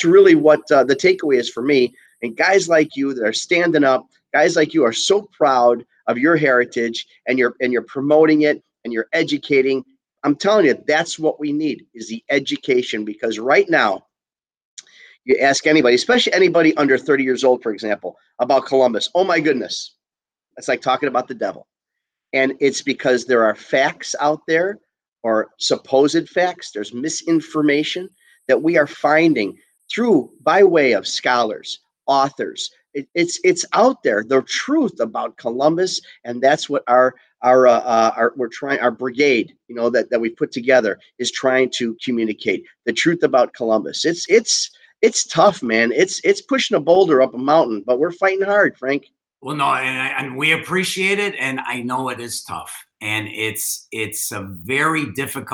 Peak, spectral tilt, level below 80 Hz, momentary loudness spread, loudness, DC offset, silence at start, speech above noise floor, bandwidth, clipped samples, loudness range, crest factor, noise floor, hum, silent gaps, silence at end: -2 dBFS; -3.5 dB/octave; -68 dBFS; 11 LU; -17 LUFS; under 0.1%; 0 s; over 73 dB; 19.5 kHz; under 0.1%; 4 LU; 16 dB; under -90 dBFS; none; 14.65-14.77 s; 0 s